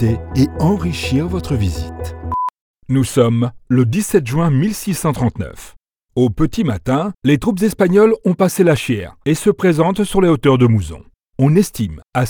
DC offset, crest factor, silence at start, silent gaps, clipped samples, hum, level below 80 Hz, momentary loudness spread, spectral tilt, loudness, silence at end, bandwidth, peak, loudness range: under 0.1%; 14 dB; 0 s; 2.61-2.74 s; under 0.1%; none; -36 dBFS; 9 LU; -6.5 dB/octave; -16 LUFS; 0 s; over 20 kHz; 0 dBFS; 4 LU